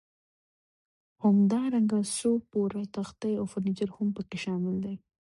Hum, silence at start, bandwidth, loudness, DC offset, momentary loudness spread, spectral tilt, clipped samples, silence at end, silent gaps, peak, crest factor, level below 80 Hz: none; 1.2 s; 11.5 kHz; -29 LUFS; under 0.1%; 11 LU; -6.5 dB/octave; under 0.1%; 0.45 s; none; -16 dBFS; 14 dB; -66 dBFS